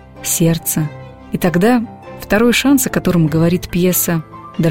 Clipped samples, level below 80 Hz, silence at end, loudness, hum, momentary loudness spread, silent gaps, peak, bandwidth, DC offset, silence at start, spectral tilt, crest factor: under 0.1%; -38 dBFS; 0 s; -15 LUFS; none; 13 LU; none; 0 dBFS; 17 kHz; 0.5%; 0.15 s; -5 dB/octave; 14 dB